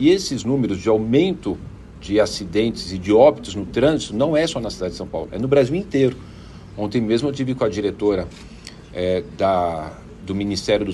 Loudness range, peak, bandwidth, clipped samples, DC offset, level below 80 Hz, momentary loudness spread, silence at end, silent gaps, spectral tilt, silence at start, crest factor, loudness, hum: 4 LU; -2 dBFS; 12 kHz; under 0.1%; under 0.1%; -44 dBFS; 17 LU; 0 s; none; -6 dB/octave; 0 s; 18 dB; -20 LUFS; none